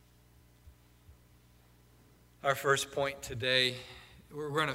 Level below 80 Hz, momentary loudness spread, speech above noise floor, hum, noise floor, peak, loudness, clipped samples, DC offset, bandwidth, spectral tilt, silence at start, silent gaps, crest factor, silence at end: -62 dBFS; 20 LU; 30 dB; 60 Hz at -65 dBFS; -62 dBFS; -14 dBFS; -31 LUFS; under 0.1%; under 0.1%; 16 kHz; -3 dB/octave; 0.65 s; none; 22 dB; 0 s